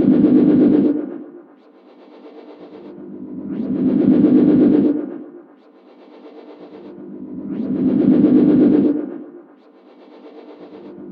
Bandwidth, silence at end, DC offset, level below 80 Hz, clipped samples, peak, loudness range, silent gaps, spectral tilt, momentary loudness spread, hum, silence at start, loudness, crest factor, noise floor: 4.3 kHz; 0 s; under 0.1%; -56 dBFS; under 0.1%; -2 dBFS; 7 LU; none; -12 dB/octave; 24 LU; none; 0 s; -15 LUFS; 16 dB; -47 dBFS